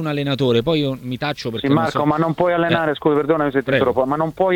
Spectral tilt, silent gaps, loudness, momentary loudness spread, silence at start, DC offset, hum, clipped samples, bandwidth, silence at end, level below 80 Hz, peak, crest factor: -7 dB/octave; none; -19 LUFS; 6 LU; 0 s; under 0.1%; none; under 0.1%; 17 kHz; 0 s; -48 dBFS; -2 dBFS; 16 dB